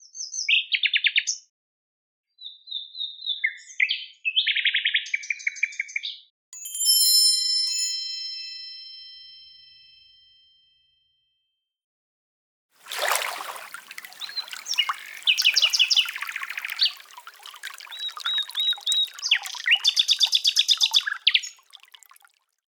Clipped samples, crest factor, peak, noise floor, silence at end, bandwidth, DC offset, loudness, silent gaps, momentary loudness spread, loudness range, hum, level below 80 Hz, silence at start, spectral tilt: under 0.1%; 24 dB; -2 dBFS; -78 dBFS; 1.15 s; over 20 kHz; under 0.1%; -21 LUFS; 1.49-2.24 s, 6.30-6.52 s, 11.84-12.69 s; 20 LU; 12 LU; none; -88 dBFS; 0.15 s; 6 dB/octave